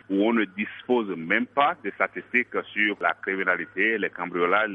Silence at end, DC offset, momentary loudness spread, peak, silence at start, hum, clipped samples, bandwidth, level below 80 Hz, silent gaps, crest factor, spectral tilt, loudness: 0 s; under 0.1%; 5 LU; -6 dBFS; 0.1 s; none; under 0.1%; 4.9 kHz; -72 dBFS; none; 20 dB; -7.5 dB/octave; -25 LUFS